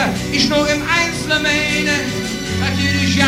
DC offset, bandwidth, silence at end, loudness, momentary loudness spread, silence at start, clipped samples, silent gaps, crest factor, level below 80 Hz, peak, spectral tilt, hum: under 0.1%; 16 kHz; 0 s; -16 LUFS; 5 LU; 0 s; under 0.1%; none; 16 dB; -38 dBFS; -2 dBFS; -4 dB/octave; none